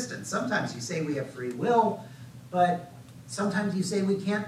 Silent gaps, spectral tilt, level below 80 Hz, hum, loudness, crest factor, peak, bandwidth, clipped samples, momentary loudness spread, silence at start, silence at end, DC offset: none; -5.5 dB/octave; -70 dBFS; none; -29 LUFS; 18 dB; -10 dBFS; 14.5 kHz; under 0.1%; 15 LU; 0 s; 0 s; under 0.1%